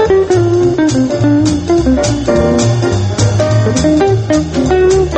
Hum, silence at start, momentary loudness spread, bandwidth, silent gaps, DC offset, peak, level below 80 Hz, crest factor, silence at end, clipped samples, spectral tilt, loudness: none; 0 s; 3 LU; 8.8 kHz; none; under 0.1%; 0 dBFS; -26 dBFS; 10 dB; 0 s; under 0.1%; -6.5 dB/octave; -11 LUFS